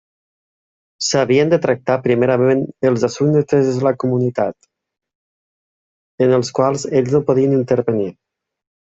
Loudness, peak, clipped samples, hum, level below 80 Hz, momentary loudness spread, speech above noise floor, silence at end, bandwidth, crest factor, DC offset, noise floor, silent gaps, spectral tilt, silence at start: -16 LUFS; -2 dBFS; under 0.1%; none; -56 dBFS; 5 LU; over 74 dB; 0.75 s; 8 kHz; 14 dB; under 0.1%; under -90 dBFS; 5.15-6.18 s; -6 dB/octave; 1 s